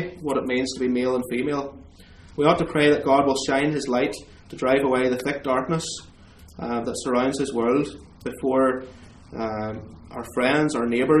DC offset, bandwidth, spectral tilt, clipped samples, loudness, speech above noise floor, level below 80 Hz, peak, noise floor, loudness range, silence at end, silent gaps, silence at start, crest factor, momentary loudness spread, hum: under 0.1%; 14 kHz; -5 dB/octave; under 0.1%; -23 LUFS; 25 dB; -50 dBFS; -2 dBFS; -47 dBFS; 4 LU; 0 s; none; 0 s; 20 dB; 16 LU; none